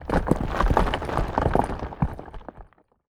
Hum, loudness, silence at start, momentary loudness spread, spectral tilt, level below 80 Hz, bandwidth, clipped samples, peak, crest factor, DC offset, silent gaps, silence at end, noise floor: none; -25 LUFS; 0 s; 18 LU; -7 dB/octave; -30 dBFS; 14 kHz; under 0.1%; -4 dBFS; 22 dB; under 0.1%; none; 0.45 s; -49 dBFS